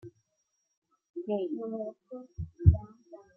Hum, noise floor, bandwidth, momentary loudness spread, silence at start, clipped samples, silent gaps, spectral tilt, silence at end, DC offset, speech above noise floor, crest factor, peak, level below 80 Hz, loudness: none; -79 dBFS; 3.3 kHz; 21 LU; 0.05 s; under 0.1%; 0.77-0.82 s, 1.09-1.14 s; -11.5 dB/octave; 0.2 s; under 0.1%; 43 dB; 26 dB; -6 dBFS; -42 dBFS; -30 LUFS